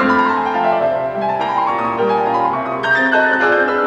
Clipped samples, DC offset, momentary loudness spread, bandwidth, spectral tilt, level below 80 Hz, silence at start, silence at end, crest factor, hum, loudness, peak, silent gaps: under 0.1%; under 0.1%; 6 LU; 9.8 kHz; -6 dB/octave; -54 dBFS; 0 s; 0 s; 12 dB; none; -16 LUFS; -4 dBFS; none